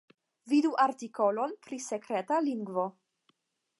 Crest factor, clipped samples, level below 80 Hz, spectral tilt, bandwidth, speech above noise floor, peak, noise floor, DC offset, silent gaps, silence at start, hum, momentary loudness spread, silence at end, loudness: 18 dB; under 0.1%; -88 dBFS; -5 dB/octave; 11.5 kHz; 44 dB; -14 dBFS; -74 dBFS; under 0.1%; none; 0.45 s; none; 10 LU; 0.9 s; -31 LUFS